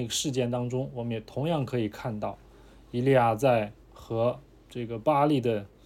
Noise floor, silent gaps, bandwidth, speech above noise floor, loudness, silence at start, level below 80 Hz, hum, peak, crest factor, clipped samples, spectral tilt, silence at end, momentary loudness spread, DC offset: -52 dBFS; none; 16.5 kHz; 25 dB; -28 LUFS; 0 s; -56 dBFS; none; -10 dBFS; 18 dB; under 0.1%; -5.5 dB/octave; 0.2 s; 14 LU; under 0.1%